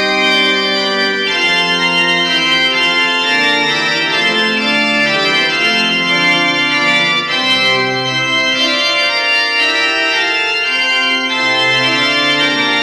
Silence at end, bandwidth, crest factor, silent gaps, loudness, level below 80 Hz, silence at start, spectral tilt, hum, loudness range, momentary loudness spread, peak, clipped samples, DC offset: 0 s; 15.5 kHz; 10 dB; none; -11 LUFS; -54 dBFS; 0 s; -2.5 dB/octave; none; 1 LU; 2 LU; -2 dBFS; under 0.1%; under 0.1%